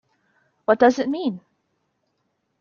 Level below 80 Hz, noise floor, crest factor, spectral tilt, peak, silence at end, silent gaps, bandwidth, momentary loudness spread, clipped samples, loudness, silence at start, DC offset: -66 dBFS; -73 dBFS; 22 dB; -5.5 dB/octave; -2 dBFS; 1.25 s; none; 7 kHz; 13 LU; under 0.1%; -20 LUFS; 0.7 s; under 0.1%